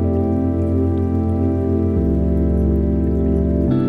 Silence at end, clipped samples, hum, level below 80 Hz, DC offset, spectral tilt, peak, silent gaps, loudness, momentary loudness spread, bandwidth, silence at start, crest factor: 0 s; under 0.1%; none; -26 dBFS; under 0.1%; -11.5 dB/octave; -6 dBFS; none; -18 LUFS; 1 LU; 3.8 kHz; 0 s; 10 dB